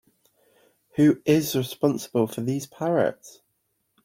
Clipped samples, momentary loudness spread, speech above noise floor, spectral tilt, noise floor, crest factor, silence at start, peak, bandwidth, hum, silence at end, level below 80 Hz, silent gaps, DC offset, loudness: under 0.1%; 8 LU; 51 dB; -6 dB/octave; -74 dBFS; 18 dB; 0.95 s; -8 dBFS; 16.5 kHz; none; 0.75 s; -64 dBFS; none; under 0.1%; -24 LUFS